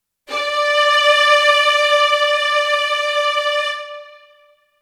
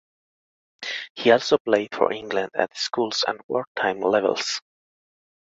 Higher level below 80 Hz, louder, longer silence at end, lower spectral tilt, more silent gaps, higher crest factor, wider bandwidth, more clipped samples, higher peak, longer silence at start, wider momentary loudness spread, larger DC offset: about the same, -72 dBFS vs -68 dBFS; first, -14 LUFS vs -23 LUFS; second, 0.7 s vs 0.85 s; second, 3 dB/octave vs -3 dB/octave; second, none vs 1.10-1.15 s, 1.60-1.65 s, 3.44-3.49 s, 3.67-3.75 s; second, 16 dB vs 22 dB; first, 14 kHz vs 8 kHz; neither; about the same, 0 dBFS vs -2 dBFS; second, 0.3 s vs 0.8 s; about the same, 12 LU vs 11 LU; neither